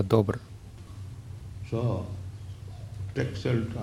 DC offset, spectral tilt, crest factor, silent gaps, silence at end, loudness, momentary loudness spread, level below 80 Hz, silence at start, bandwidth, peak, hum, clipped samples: under 0.1%; -8 dB/octave; 24 dB; none; 0 s; -32 LUFS; 16 LU; -50 dBFS; 0 s; 12.5 kHz; -6 dBFS; none; under 0.1%